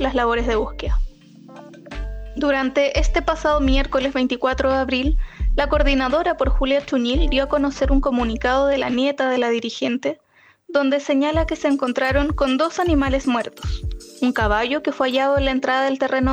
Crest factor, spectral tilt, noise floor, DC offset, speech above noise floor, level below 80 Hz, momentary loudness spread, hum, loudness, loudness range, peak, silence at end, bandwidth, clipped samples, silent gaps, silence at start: 14 dB; -5.5 dB/octave; -43 dBFS; under 0.1%; 24 dB; -26 dBFS; 8 LU; none; -20 LUFS; 2 LU; -4 dBFS; 0 s; 9.4 kHz; under 0.1%; none; 0 s